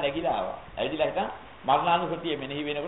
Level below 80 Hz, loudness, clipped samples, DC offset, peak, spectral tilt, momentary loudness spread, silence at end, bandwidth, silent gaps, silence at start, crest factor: -54 dBFS; -28 LUFS; under 0.1%; 0.2%; -10 dBFS; -2.5 dB/octave; 10 LU; 0 s; 4.1 kHz; none; 0 s; 20 dB